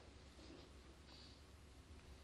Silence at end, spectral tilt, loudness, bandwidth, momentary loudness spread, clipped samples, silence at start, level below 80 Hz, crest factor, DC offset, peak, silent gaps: 0 s; -4.5 dB/octave; -62 LUFS; 12 kHz; 3 LU; under 0.1%; 0 s; -64 dBFS; 14 dB; under 0.1%; -48 dBFS; none